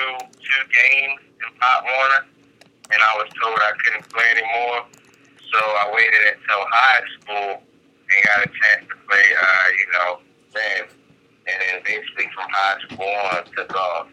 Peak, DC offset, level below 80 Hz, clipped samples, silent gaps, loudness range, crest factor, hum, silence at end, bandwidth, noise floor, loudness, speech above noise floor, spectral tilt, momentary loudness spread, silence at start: -2 dBFS; under 0.1%; -72 dBFS; under 0.1%; none; 6 LU; 18 dB; none; 0.1 s; 12 kHz; -53 dBFS; -17 LUFS; 34 dB; -1.5 dB/octave; 12 LU; 0 s